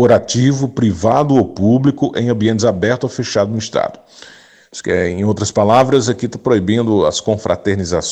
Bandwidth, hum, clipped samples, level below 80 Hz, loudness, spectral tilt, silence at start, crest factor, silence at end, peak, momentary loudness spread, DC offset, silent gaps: 9.2 kHz; none; under 0.1%; -46 dBFS; -15 LUFS; -6 dB/octave; 0 s; 12 dB; 0 s; -2 dBFS; 7 LU; under 0.1%; none